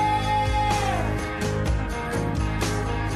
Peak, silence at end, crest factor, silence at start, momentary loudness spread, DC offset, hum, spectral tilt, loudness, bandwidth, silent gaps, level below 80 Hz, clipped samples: -12 dBFS; 0 s; 12 dB; 0 s; 4 LU; under 0.1%; none; -5.5 dB/octave; -25 LUFS; 13.5 kHz; none; -30 dBFS; under 0.1%